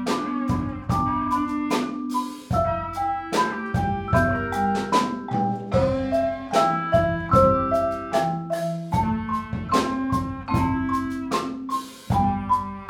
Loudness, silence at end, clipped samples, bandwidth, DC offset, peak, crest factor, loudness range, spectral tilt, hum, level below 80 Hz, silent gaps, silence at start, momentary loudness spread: -24 LUFS; 0 s; under 0.1%; 18 kHz; under 0.1%; -4 dBFS; 18 dB; 3 LU; -6.5 dB/octave; none; -40 dBFS; none; 0 s; 6 LU